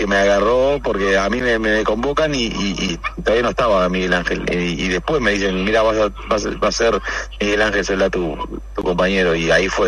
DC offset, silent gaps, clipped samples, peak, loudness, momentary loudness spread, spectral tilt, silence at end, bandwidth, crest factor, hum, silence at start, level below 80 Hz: under 0.1%; none; under 0.1%; -2 dBFS; -18 LUFS; 6 LU; -4.5 dB/octave; 0 s; 11 kHz; 16 dB; none; 0 s; -32 dBFS